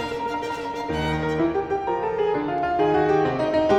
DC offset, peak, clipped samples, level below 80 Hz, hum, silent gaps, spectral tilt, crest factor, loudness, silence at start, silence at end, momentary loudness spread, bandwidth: under 0.1%; -8 dBFS; under 0.1%; -44 dBFS; none; none; -6.5 dB/octave; 16 dB; -23 LUFS; 0 s; 0 s; 7 LU; 10.5 kHz